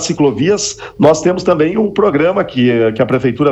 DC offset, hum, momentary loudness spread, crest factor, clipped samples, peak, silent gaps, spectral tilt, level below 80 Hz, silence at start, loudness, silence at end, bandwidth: under 0.1%; none; 3 LU; 12 dB; under 0.1%; 0 dBFS; none; -5.5 dB/octave; -44 dBFS; 0 s; -13 LUFS; 0 s; 8.4 kHz